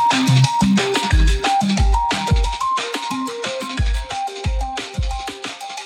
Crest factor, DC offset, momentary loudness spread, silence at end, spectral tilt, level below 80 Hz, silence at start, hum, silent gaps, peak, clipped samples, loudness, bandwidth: 14 dB; under 0.1%; 11 LU; 0 s; -5 dB/octave; -22 dBFS; 0 s; none; none; -4 dBFS; under 0.1%; -19 LUFS; 14 kHz